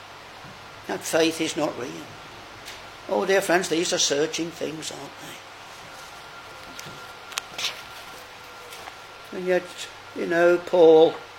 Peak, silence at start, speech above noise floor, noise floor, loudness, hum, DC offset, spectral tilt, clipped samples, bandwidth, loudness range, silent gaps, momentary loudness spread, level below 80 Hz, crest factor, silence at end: -2 dBFS; 0 s; 20 dB; -42 dBFS; -23 LUFS; none; under 0.1%; -3 dB/octave; under 0.1%; 17 kHz; 11 LU; none; 21 LU; -64 dBFS; 24 dB; 0 s